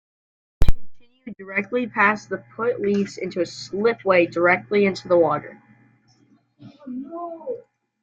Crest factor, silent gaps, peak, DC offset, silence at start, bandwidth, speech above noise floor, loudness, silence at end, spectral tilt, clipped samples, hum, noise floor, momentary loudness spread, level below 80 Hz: 22 dB; none; 0 dBFS; under 0.1%; 0.6 s; 7.6 kHz; 37 dB; -22 LUFS; 0.45 s; -6 dB/octave; under 0.1%; none; -59 dBFS; 17 LU; -32 dBFS